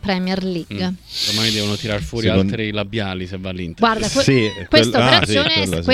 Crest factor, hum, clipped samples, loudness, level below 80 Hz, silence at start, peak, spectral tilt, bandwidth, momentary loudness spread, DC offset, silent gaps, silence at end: 18 dB; none; under 0.1%; -17 LUFS; -40 dBFS; 0.05 s; 0 dBFS; -4.5 dB/octave; 15.5 kHz; 12 LU; under 0.1%; none; 0 s